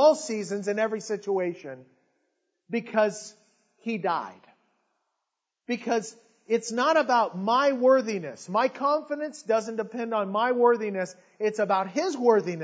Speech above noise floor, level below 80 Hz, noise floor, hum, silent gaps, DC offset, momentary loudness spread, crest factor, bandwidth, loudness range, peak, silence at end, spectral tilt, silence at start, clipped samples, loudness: 58 dB; -88 dBFS; -84 dBFS; none; none; under 0.1%; 12 LU; 20 dB; 8 kHz; 7 LU; -8 dBFS; 0 s; -4.5 dB/octave; 0 s; under 0.1%; -26 LUFS